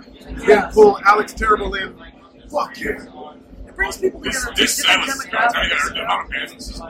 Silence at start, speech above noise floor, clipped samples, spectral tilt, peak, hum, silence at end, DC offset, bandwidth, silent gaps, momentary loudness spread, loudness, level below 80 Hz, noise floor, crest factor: 0 s; 21 dB; under 0.1%; -2 dB/octave; 0 dBFS; none; 0 s; under 0.1%; 16.5 kHz; none; 14 LU; -17 LUFS; -38 dBFS; -39 dBFS; 18 dB